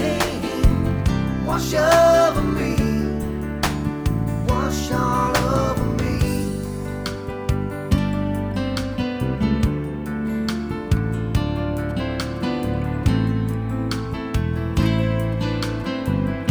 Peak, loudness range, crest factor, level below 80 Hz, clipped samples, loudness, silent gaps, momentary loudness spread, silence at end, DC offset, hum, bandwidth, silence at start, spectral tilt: -2 dBFS; 5 LU; 18 dB; -30 dBFS; under 0.1%; -22 LUFS; none; 6 LU; 0 s; under 0.1%; none; over 20 kHz; 0 s; -6.5 dB/octave